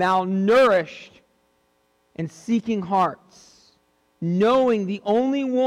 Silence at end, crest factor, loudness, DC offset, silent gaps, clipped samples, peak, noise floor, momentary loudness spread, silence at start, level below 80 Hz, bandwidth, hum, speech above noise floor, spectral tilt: 0 s; 12 dB; -21 LUFS; under 0.1%; none; under 0.1%; -10 dBFS; -66 dBFS; 16 LU; 0 s; -64 dBFS; 11.5 kHz; none; 45 dB; -6.5 dB/octave